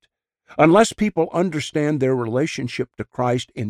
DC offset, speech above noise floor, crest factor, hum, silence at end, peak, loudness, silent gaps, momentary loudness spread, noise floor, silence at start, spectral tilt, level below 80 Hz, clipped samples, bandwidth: under 0.1%; 44 dB; 18 dB; none; 0 s; -4 dBFS; -20 LUFS; none; 13 LU; -63 dBFS; 0.5 s; -6 dB/octave; -54 dBFS; under 0.1%; 13.5 kHz